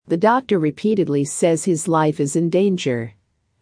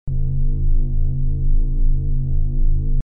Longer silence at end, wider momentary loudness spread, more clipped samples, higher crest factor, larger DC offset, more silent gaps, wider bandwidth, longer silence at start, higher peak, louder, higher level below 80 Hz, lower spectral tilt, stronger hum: first, 0.5 s vs 0.05 s; first, 5 LU vs 1 LU; neither; first, 16 dB vs 8 dB; neither; neither; first, 10.5 kHz vs 0.7 kHz; about the same, 0.1 s vs 0.05 s; first, -4 dBFS vs -8 dBFS; first, -19 LUFS vs -24 LUFS; second, -64 dBFS vs -16 dBFS; second, -5.5 dB/octave vs -14 dB/octave; neither